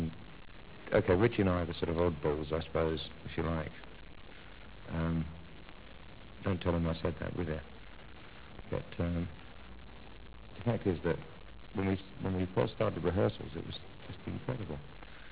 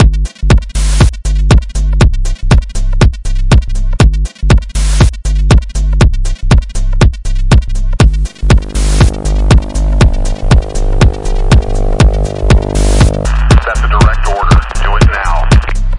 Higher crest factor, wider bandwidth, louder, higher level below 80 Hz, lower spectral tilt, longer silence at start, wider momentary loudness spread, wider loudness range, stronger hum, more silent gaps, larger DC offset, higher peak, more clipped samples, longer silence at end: first, 22 dB vs 8 dB; second, 4 kHz vs 11.5 kHz; second, -35 LUFS vs -11 LUFS; second, -48 dBFS vs -10 dBFS; about the same, -6 dB/octave vs -6 dB/octave; about the same, 0 s vs 0 s; first, 21 LU vs 6 LU; first, 8 LU vs 1 LU; neither; neither; first, 0.3% vs under 0.1%; second, -14 dBFS vs 0 dBFS; second, under 0.1% vs 0.5%; about the same, 0 s vs 0 s